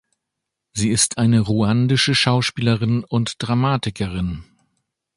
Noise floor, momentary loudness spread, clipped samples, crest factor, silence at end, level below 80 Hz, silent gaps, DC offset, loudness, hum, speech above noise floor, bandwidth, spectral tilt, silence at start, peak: -81 dBFS; 9 LU; under 0.1%; 18 dB; 0.75 s; -44 dBFS; none; under 0.1%; -19 LUFS; none; 62 dB; 11.5 kHz; -4.5 dB/octave; 0.75 s; -2 dBFS